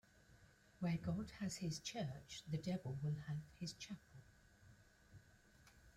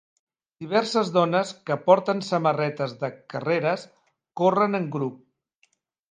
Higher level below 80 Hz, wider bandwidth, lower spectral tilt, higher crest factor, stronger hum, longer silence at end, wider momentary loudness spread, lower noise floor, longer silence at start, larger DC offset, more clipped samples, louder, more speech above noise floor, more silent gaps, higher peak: first, -70 dBFS vs -76 dBFS; first, 15 kHz vs 9.6 kHz; about the same, -5.5 dB/octave vs -6 dB/octave; second, 16 dB vs 22 dB; neither; second, 0.05 s vs 0.95 s; first, 24 LU vs 12 LU; about the same, -69 dBFS vs -68 dBFS; second, 0.15 s vs 0.6 s; neither; neither; second, -47 LUFS vs -24 LUFS; second, 23 dB vs 45 dB; neither; second, -32 dBFS vs -4 dBFS